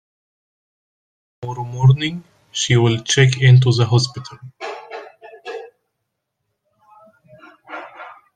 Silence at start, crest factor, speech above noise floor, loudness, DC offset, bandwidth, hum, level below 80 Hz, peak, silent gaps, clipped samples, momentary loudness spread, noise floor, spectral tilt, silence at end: 1.4 s; 18 dB; 61 dB; -16 LUFS; under 0.1%; 9.2 kHz; none; -54 dBFS; -2 dBFS; none; under 0.1%; 23 LU; -76 dBFS; -5 dB/octave; 0.25 s